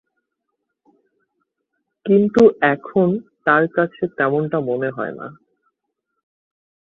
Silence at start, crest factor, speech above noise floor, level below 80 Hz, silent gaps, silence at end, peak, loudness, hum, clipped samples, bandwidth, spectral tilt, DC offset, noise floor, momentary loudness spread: 2.05 s; 18 dB; 60 dB; -60 dBFS; none; 1.55 s; -2 dBFS; -18 LUFS; none; under 0.1%; 7.4 kHz; -8 dB/octave; under 0.1%; -77 dBFS; 15 LU